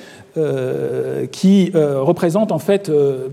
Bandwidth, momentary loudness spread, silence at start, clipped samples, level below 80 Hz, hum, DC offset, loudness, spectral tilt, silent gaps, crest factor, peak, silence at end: 14.5 kHz; 8 LU; 0 s; under 0.1%; -62 dBFS; none; under 0.1%; -17 LUFS; -7.5 dB/octave; none; 14 dB; -2 dBFS; 0 s